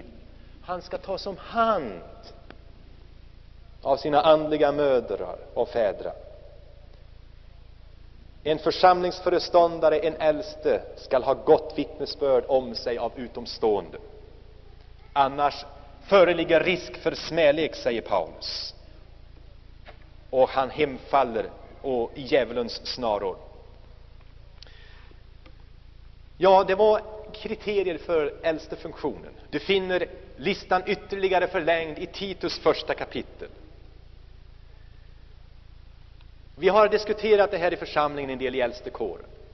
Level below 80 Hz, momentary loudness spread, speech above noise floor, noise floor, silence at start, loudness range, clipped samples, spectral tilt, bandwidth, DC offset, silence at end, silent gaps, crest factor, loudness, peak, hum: -48 dBFS; 15 LU; 23 dB; -47 dBFS; 0 s; 8 LU; under 0.1%; -3 dB/octave; 6.4 kHz; under 0.1%; 0.05 s; none; 20 dB; -25 LUFS; -6 dBFS; none